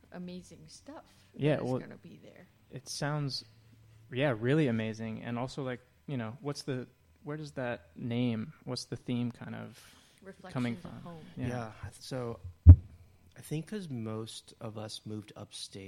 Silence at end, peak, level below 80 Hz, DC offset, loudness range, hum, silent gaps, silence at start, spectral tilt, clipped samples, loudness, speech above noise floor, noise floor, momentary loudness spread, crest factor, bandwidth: 0 s; -4 dBFS; -40 dBFS; under 0.1%; 11 LU; none; none; 0.1 s; -7 dB/octave; under 0.1%; -32 LUFS; 27 dB; -58 dBFS; 21 LU; 28 dB; 11.5 kHz